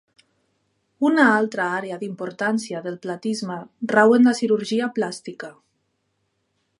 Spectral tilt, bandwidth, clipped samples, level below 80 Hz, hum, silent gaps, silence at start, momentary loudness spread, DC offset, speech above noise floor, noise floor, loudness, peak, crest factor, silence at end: -5 dB/octave; 11.5 kHz; under 0.1%; -76 dBFS; none; none; 1 s; 15 LU; under 0.1%; 51 dB; -72 dBFS; -21 LUFS; -2 dBFS; 20 dB; 1.3 s